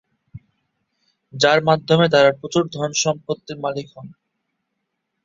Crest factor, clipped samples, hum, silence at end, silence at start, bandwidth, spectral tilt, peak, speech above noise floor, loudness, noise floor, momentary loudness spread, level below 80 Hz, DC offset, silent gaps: 20 dB; under 0.1%; none; 1.15 s; 0.35 s; 7.8 kHz; -4 dB/octave; 0 dBFS; 58 dB; -18 LUFS; -76 dBFS; 14 LU; -60 dBFS; under 0.1%; none